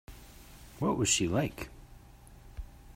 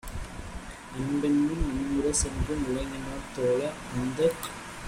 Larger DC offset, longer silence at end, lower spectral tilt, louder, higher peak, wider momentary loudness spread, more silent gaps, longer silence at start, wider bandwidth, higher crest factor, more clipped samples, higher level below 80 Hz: neither; about the same, 0.05 s vs 0 s; second, -3.5 dB/octave vs -5 dB/octave; about the same, -30 LUFS vs -29 LUFS; about the same, -14 dBFS vs -12 dBFS; first, 25 LU vs 14 LU; neither; about the same, 0.1 s vs 0.05 s; about the same, 16 kHz vs 16 kHz; about the same, 20 dB vs 16 dB; neither; second, -50 dBFS vs -40 dBFS